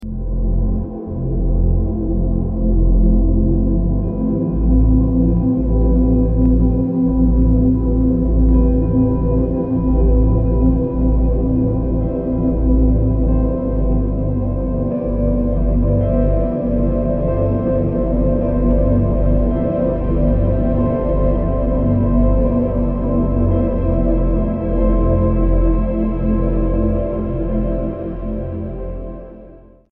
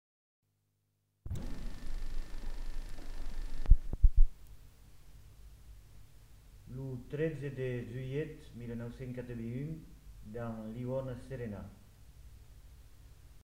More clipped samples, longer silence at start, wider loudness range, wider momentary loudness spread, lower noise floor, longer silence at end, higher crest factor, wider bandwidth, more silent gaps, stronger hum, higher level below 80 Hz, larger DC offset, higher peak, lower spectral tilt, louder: neither; second, 0 s vs 1.25 s; second, 3 LU vs 7 LU; second, 5 LU vs 26 LU; second, -41 dBFS vs -79 dBFS; first, 0.35 s vs 0.05 s; second, 12 dB vs 26 dB; second, 2.8 kHz vs 6 kHz; neither; neither; first, -18 dBFS vs -36 dBFS; neither; first, -2 dBFS vs -8 dBFS; first, -14 dB/octave vs -8 dB/octave; first, -17 LUFS vs -40 LUFS